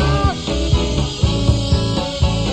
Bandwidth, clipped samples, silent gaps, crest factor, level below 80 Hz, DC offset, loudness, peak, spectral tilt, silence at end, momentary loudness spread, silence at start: 9.6 kHz; under 0.1%; none; 14 dB; -22 dBFS; under 0.1%; -18 LUFS; -2 dBFS; -5.5 dB/octave; 0 s; 3 LU; 0 s